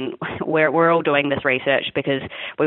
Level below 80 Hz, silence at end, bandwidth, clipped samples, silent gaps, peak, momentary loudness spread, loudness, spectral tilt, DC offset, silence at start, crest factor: -56 dBFS; 0 s; 4.2 kHz; under 0.1%; none; -4 dBFS; 11 LU; -19 LUFS; -9.5 dB/octave; under 0.1%; 0 s; 16 dB